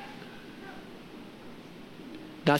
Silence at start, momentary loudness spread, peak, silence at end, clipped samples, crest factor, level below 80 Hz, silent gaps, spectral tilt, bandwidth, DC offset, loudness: 0 s; 3 LU; -10 dBFS; 0 s; under 0.1%; 26 dB; -64 dBFS; none; -6 dB/octave; 16.5 kHz; under 0.1%; -42 LUFS